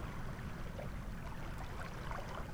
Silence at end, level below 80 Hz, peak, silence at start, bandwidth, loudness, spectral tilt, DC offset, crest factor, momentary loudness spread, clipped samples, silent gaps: 0 s; -48 dBFS; -28 dBFS; 0 s; 19.5 kHz; -46 LUFS; -6 dB/octave; under 0.1%; 14 dB; 2 LU; under 0.1%; none